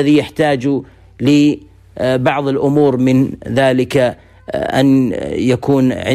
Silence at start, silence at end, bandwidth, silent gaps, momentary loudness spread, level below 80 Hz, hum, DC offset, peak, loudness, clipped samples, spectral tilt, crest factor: 0 s; 0 s; 13.5 kHz; none; 8 LU; -44 dBFS; none; under 0.1%; -2 dBFS; -14 LUFS; under 0.1%; -7 dB/octave; 12 dB